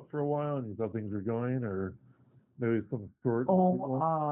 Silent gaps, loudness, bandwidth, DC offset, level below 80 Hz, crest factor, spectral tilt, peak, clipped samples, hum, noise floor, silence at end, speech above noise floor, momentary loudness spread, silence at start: none; -32 LUFS; 3.3 kHz; under 0.1%; -72 dBFS; 18 dB; -6.5 dB/octave; -14 dBFS; under 0.1%; none; -63 dBFS; 0 s; 32 dB; 9 LU; 0 s